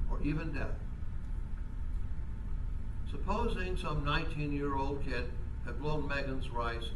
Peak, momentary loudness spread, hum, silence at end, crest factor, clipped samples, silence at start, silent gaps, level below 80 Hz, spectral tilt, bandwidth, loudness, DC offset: -18 dBFS; 8 LU; none; 0 s; 16 dB; under 0.1%; 0 s; none; -36 dBFS; -7 dB/octave; 11 kHz; -38 LUFS; under 0.1%